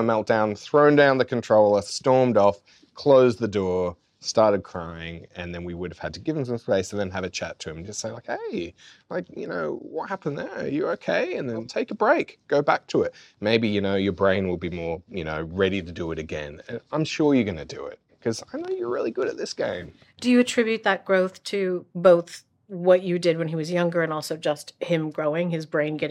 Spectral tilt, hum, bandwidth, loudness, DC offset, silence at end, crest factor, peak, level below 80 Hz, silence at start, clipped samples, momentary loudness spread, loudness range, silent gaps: -5.5 dB/octave; none; 13 kHz; -24 LUFS; under 0.1%; 0 s; 18 dB; -6 dBFS; -60 dBFS; 0 s; under 0.1%; 15 LU; 9 LU; none